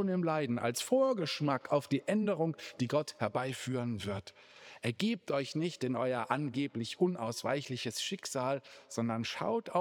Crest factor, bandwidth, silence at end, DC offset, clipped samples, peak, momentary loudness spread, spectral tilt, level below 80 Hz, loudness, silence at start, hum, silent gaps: 20 dB; over 20 kHz; 0 s; under 0.1%; under 0.1%; -14 dBFS; 7 LU; -5 dB/octave; -80 dBFS; -34 LUFS; 0 s; none; none